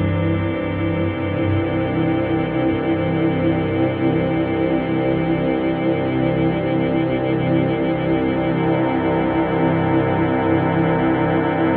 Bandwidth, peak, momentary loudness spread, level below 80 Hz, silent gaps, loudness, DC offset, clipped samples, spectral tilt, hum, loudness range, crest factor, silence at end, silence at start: 4.4 kHz; -4 dBFS; 2 LU; -42 dBFS; none; -19 LUFS; under 0.1%; under 0.1%; -11.5 dB/octave; none; 1 LU; 14 dB; 0 s; 0 s